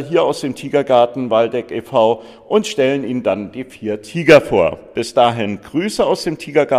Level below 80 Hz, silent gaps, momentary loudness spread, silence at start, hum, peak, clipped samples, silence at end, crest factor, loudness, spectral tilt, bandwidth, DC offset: -50 dBFS; none; 12 LU; 0 s; none; 0 dBFS; under 0.1%; 0 s; 16 dB; -16 LUFS; -5.5 dB/octave; 14 kHz; under 0.1%